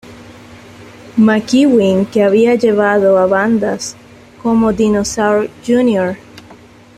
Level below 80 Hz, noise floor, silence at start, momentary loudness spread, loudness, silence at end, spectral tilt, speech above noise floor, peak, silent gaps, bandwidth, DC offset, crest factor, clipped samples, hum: -46 dBFS; -40 dBFS; 0.05 s; 10 LU; -13 LUFS; 0.45 s; -5.5 dB/octave; 28 dB; -2 dBFS; none; 13 kHz; under 0.1%; 12 dB; under 0.1%; none